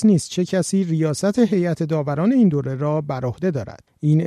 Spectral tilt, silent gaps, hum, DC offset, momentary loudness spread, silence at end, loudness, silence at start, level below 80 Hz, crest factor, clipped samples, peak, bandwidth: -7 dB/octave; none; none; under 0.1%; 7 LU; 0 s; -20 LUFS; 0 s; -56 dBFS; 14 dB; under 0.1%; -6 dBFS; 12.5 kHz